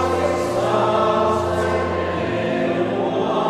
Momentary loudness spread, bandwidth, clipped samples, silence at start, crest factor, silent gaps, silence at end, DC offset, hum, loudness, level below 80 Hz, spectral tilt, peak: 5 LU; 14 kHz; under 0.1%; 0 s; 14 dB; none; 0 s; under 0.1%; none; -20 LUFS; -44 dBFS; -6 dB/octave; -6 dBFS